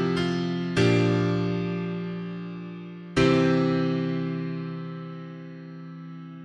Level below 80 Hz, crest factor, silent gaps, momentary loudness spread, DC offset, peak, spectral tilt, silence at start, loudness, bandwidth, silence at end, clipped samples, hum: -52 dBFS; 18 dB; none; 19 LU; under 0.1%; -8 dBFS; -7 dB/octave; 0 s; -26 LUFS; 10.5 kHz; 0 s; under 0.1%; none